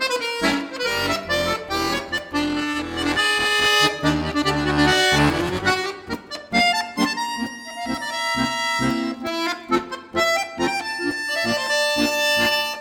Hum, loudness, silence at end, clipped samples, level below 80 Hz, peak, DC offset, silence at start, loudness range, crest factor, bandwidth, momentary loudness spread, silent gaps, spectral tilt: none; -21 LUFS; 0 s; under 0.1%; -44 dBFS; -4 dBFS; under 0.1%; 0 s; 4 LU; 18 dB; over 20 kHz; 9 LU; none; -3.5 dB/octave